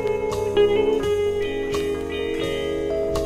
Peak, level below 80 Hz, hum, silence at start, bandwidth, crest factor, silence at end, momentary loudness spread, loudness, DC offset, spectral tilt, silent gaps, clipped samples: -8 dBFS; -40 dBFS; none; 0 s; 14.5 kHz; 14 dB; 0 s; 7 LU; -23 LUFS; under 0.1%; -5.5 dB/octave; none; under 0.1%